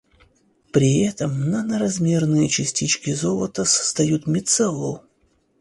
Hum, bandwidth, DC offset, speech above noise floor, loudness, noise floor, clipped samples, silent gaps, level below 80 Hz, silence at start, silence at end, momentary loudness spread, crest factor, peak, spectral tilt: none; 11.5 kHz; under 0.1%; 43 dB; -20 LUFS; -63 dBFS; under 0.1%; none; -54 dBFS; 0.75 s; 0.65 s; 5 LU; 18 dB; -4 dBFS; -4.5 dB/octave